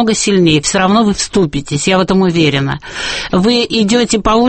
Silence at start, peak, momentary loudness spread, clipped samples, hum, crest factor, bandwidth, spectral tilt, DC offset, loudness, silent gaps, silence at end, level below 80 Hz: 0 s; 0 dBFS; 6 LU; under 0.1%; none; 12 dB; 8.8 kHz; -4.5 dB/octave; under 0.1%; -12 LUFS; none; 0 s; -34 dBFS